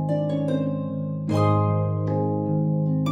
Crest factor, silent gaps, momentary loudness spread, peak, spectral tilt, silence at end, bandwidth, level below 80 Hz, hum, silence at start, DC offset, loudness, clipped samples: 14 dB; none; 6 LU; -10 dBFS; -9.5 dB/octave; 0 s; 8.8 kHz; -62 dBFS; 50 Hz at -50 dBFS; 0 s; under 0.1%; -24 LUFS; under 0.1%